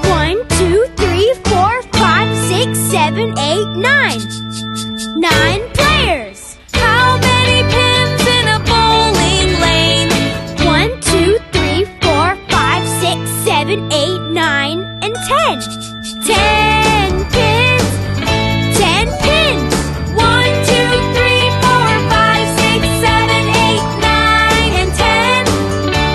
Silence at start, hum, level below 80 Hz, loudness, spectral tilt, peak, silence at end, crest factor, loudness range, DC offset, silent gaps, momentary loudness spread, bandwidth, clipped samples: 0 s; none; -26 dBFS; -12 LUFS; -4 dB/octave; 0 dBFS; 0 s; 12 dB; 3 LU; under 0.1%; none; 6 LU; 13 kHz; under 0.1%